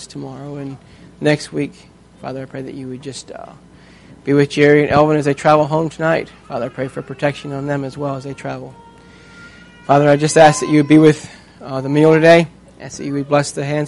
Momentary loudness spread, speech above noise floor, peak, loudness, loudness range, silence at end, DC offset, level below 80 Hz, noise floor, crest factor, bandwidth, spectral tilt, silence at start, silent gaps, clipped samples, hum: 20 LU; 27 dB; 0 dBFS; -15 LUFS; 12 LU; 0 s; under 0.1%; -50 dBFS; -42 dBFS; 16 dB; 11.5 kHz; -6 dB/octave; 0 s; none; under 0.1%; none